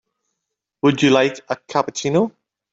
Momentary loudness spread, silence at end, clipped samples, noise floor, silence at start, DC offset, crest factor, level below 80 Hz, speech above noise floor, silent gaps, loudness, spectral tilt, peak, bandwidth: 9 LU; 0.45 s; under 0.1%; -80 dBFS; 0.85 s; under 0.1%; 18 dB; -62 dBFS; 62 dB; none; -19 LUFS; -5 dB/octave; -2 dBFS; 7.8 kHz